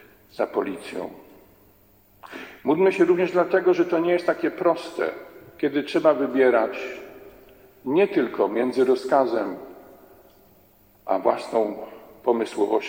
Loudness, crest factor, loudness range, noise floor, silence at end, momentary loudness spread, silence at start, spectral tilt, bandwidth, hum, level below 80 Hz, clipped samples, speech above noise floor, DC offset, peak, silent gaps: -23 LUFS; 20 dB; 4 LU; -57 dBFS; 0 s; 19 LU; 0.35 s; -6 dB/octave; 16.5 kHz; none; -66 dBFS; under 0.1%; 35 dB; under 0.1%; -4 dBFS; none